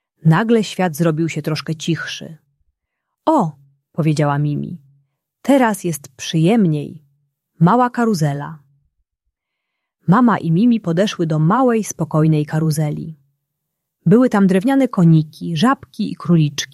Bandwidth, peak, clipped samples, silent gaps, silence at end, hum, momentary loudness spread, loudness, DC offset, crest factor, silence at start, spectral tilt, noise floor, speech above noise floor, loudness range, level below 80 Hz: 13.5 kHz; -2 dBFS; under 0.1%; none; 0.1 s; none; 12 LU; -17 LUFS; under 0.1%; 14 dB; 0.25 s; -6.5 dB/octave; -78 dBFS; 62 dB; 5 LU; -58 dBFS